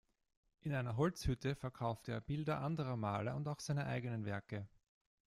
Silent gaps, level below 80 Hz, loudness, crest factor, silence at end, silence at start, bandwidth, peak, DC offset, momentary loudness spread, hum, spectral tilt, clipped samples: none; -60 dBFS; -41 LUFS; 18 dB; 0.6 s; 0.65 s; 14 kHz; -22 dBFS; under 0.1%; 7 LU; none; -6.5 dB/octave; under 0.1%